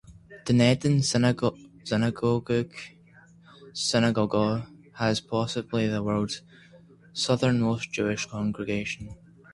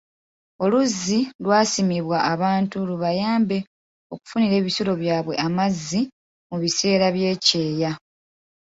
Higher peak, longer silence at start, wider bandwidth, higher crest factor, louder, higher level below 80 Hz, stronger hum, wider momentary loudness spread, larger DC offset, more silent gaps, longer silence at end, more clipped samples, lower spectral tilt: second, -6 dBFS vs -2 dBFS; second, 0.1 s vs 0.6 s; first, 11.5 kHz vs 8 kHz; about the same, 20 dB vs 20 dB; second, -26 LUFS vs -21 LUFS; about the same, -56 dBFS vs -60 dBFS; neither; first, 15 LU vs 9 LU; neither; second, none vs 1.35-1.39 s, 3.67-4.10 s, 6.12-6.50 s; second, 0.4 s vs 0.75 s; neither; about the same, -5.5 dB/octave vs -4.5 dB/octave